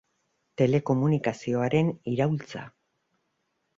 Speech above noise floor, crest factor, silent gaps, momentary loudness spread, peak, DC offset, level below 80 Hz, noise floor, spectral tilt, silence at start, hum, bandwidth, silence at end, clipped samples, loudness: 51 dB; 18 dB; none; 14 LU; -10 dBFS; under 0.1%; -62 dBFS; -76 dBFS; -8 dB/octave; 0.6 s; none; 7.6 kHz; 1.1 s; under 0.1%; -26 LUFS